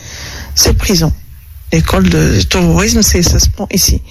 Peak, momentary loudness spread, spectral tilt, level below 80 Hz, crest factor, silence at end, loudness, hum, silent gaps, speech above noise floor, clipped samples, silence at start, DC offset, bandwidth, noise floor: 0 dBFS; 8 LU; -4 dB/octave; -18 dBFS; 12 dB; 0 s; -10 LUFS; none; none; 21 dB; under 0.1%; 0 s; under 0.1%; 15.5 kHz; -31 dBFS